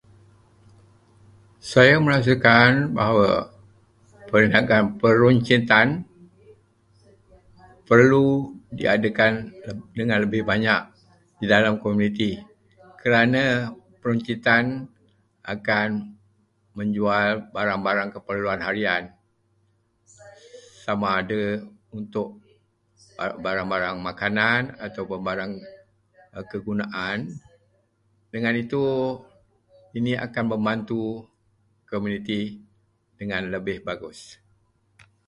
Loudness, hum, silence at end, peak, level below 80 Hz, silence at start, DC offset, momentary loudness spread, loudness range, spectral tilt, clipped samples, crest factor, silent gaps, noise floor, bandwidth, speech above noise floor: -22 LUFS; none; 0.95 s; 0 dBFS; -56 dBFS; 1.65 s; under 0.1%; 19 LU; 11 LU; -6.5 dB/octave; under 0.1%; 24 dB; none; -66 dBFS; 11 kHz; 45 dB